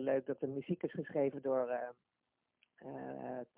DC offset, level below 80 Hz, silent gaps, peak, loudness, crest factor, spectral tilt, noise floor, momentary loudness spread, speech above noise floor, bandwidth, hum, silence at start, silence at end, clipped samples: under 0.1%; -80 dBFS; none; -22 dBFS; -39 LUFS; 16 dB; -7 dB/octave; -79 dBFS; 12 LU; 40 dB; 3.8 kHz; none; 0 s; 0.15 s; under 0.1%